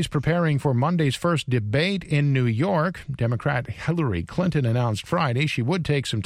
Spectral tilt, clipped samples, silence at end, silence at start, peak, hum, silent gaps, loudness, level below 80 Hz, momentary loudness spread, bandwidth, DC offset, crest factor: -6.5 dB/octave; under 0.1%; 0 s; 0 s; -8 dBFS; none; none; -23 LUFS; -48 dBFS; 4 LU; 12.5 kHz; under 0.1%; 14 dB